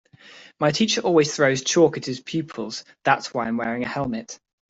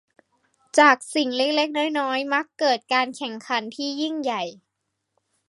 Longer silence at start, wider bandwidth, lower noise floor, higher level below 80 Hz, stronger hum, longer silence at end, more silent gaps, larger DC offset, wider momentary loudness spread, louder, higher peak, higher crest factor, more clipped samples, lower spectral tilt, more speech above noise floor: second, 0.25 s vs 0.75 s; second, 8 kHz vs 11.5 kHz; second, -48 dBFS vs -78 dBFS; first, -62 dBFS vs -82 dBFS; neither; second, 0.35 s vs 0.95 s; neither; neither; about the same, 12 LU vs 11 LU; about the same, -22 LUFS vs -22 LUFS; about the same, -4 dBFS vs -2 dBFS; about the same, 20 dB vs 22 dB; neither; first, -4 dB/octave vs -2 dB/octave; second, 26 dB vs 56 dB